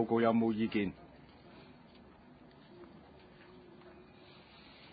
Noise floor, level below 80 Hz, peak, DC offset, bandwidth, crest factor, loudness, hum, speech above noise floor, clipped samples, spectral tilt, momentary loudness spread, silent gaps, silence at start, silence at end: -58 dBFS; -66 dBFS; -18 dBFS; under 0.1%; 4.8 kHz; 20 dB; -32 LUFS; none; 27 dB; under 0.1%; -5.5 dB/octave; 28 LU; none; 0 s; 0.9 s